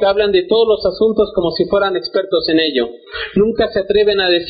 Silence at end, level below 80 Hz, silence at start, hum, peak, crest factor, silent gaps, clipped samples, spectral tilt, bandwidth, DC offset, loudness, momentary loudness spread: 0 s; -42 dBFS; 0 s; none; -2 dBFS; 12 dB; none; under 0.1%; -2.5 dB/octave; 5 kHz; under 0.1%; -15 LUFS; 6 LU